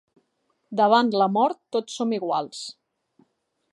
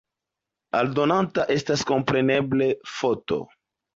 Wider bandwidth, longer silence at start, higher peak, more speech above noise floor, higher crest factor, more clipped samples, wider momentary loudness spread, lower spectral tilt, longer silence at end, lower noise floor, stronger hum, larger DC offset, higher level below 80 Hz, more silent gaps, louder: first, 11.5 kHz vs 7.8 kHz; about the same, 0.7 s vs 0.75 s; about the same, -6 dBFS vs -8 dBFS; second, 50 dB vs 63 dB; about the same, 20 dB vs 16 dB; neither; first, 15 LU vs 6 LU; about the same, -5 dB/octave vs -5.5 dB/octave; first, 1 s vs 0.5 s; second, -72 dBFS vs -86 dBFS; neither; neither; second, -80 dBFS vs -60 dBFS; neither; about the same, -23 LUFS vs -23 LUFS